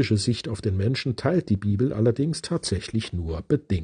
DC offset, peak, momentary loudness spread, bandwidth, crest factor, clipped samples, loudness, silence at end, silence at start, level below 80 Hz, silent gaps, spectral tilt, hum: under 0.1%; -8 dBFS; 5 LU; 10 kHz; 16 dB; under 0.1%; -25 LUFS; 0 s; 0 s; -48 dBFS; none; -6 dB/octave; none